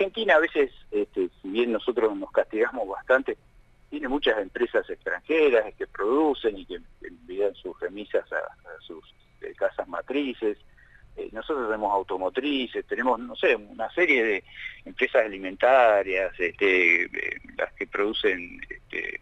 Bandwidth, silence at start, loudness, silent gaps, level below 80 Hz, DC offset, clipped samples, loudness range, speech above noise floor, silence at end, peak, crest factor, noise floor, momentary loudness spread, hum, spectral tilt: 8 kHz; 0 s; -25 LUFS; none; -54 dBFS; under 0.1%; under 0.1%; 9 LU; 24 dB; 0.05 s; -6 dBFS; 20 dB; -50 dBFS; 18 LU; none; -5 dB/octave